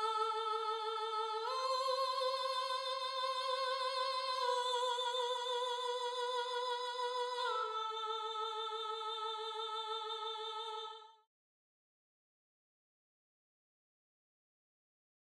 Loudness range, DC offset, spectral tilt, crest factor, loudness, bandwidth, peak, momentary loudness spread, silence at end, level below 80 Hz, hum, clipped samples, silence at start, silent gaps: 9 LU; under 0.1%; 3.5 dB/octave; 16 dB; -38 LUFS; 13 kHz; -24 dBFS; 5 LU; 4.25 s; under -90 dBFS; none; under 0.1%; 0 s; none